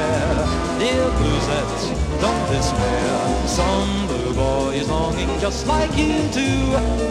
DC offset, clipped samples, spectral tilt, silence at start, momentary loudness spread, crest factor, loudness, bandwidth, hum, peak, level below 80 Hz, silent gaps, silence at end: under 0.1%; under 0.1%; -5 dB/octave; 0 s; 3 LU; 14 dB; -20 LUFS; 12.5 kHz; none; -6 dBFS; -26 dBFS; none; 0 s